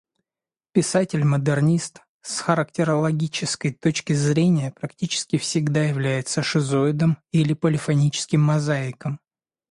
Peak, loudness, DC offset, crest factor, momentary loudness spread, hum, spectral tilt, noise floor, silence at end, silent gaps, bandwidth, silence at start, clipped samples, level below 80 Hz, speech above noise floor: -4 dBFS; -22 LUFS; under 0.1%; 18 dB; 8 LU; none; -5.5 dB/octave; under -90 dBFS; 0.55 s; 2.09-2.20 s; 11.5 kHz; 0.75 s; under 0.1%; -60 dBFS; over 69 dB